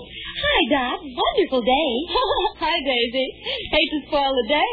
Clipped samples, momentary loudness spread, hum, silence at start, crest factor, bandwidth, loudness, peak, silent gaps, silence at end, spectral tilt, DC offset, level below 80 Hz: under 0.1%; 6 LU; none; 0 s; 18 dB; 4.9 kHz; -21 LUFS; -4 dBFS; none; 0 s; -6 dB/octave; under 0.1%; -42 dBFS